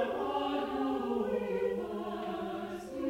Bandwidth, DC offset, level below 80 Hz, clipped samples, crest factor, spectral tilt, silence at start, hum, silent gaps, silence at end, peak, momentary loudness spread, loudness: 16 kHz; under 0.1%; -62 dBFS; under 0.1%; 14 dB; -6 dB/octave; 0 s; none; none; 0 s; -20 dBFS; 5 LU; -35 LUFS